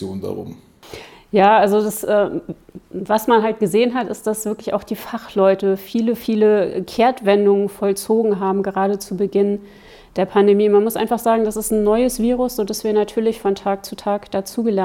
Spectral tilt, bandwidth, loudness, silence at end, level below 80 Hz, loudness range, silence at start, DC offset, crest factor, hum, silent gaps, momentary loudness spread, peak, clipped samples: -5.5 dB/octave; 18 kHz; -18 LUFS; 0 s; -48 dBFS; 2 LU; 0 s; under 0.1%; 16 dB; none; none; 13 LU; -2 dBFS; under 0.1%